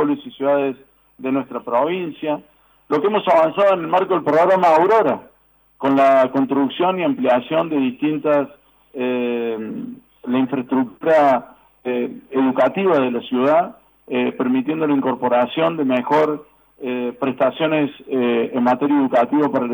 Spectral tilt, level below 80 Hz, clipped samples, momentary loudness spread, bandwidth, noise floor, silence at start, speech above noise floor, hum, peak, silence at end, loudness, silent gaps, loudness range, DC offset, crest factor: -7.5 dB/octave; -66 dBFS; under 0.1%; 11 LU; over 20 kHz; -47 dBFS; 0 s; 30 dB; none; -6 dBFS; 0 s; -18 LUFS; none; 4 LU; under 0.1%; 12 dB